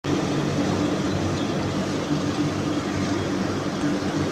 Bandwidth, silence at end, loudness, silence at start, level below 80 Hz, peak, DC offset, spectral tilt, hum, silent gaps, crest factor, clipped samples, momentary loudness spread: 13 kHz; 0 s; -25 LUFS; 0.05 s; -50 dBFS; -12 dBFS; under 0.1%; -5.5 dB/octave; none; none; 12 dB; under 0.1%; 2 LU